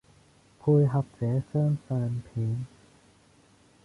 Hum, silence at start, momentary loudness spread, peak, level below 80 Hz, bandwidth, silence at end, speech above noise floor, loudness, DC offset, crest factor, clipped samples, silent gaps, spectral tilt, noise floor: none; 0.65 s; 9 LU; -14 dBFS; -60 dBFS; 10.5 kHz; 1.2 s; 34 dB; -28 LUFS; under 0.1%; 16 dB; under 0.1%; none; -10.5 dB/octave; -60 dBFS